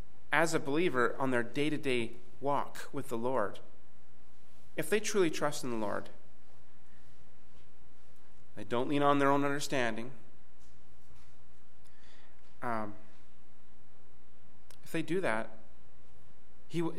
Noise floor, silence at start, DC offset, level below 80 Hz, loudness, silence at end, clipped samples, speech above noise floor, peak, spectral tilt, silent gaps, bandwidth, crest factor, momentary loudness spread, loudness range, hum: -65 dBFS; 0.3 s; 3%; -68 dBFS; -33 LUFS; 0 s; under 0.1%; 32 dB; -12 dBFS; -4.5 dB/octave; none; 16 kHz; 24 dB; 14 LU; 13 LU; none